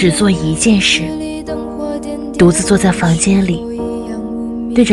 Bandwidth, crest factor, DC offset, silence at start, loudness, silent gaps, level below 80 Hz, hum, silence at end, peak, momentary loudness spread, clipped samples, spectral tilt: 12.5 kHz; 14 dB; under 0.1%; 0 s; -14 LUFS; none; -34 dBFS; none; 0 s; 0 dBFS; 11 LU; under 0.1%; -4.5 dB/octave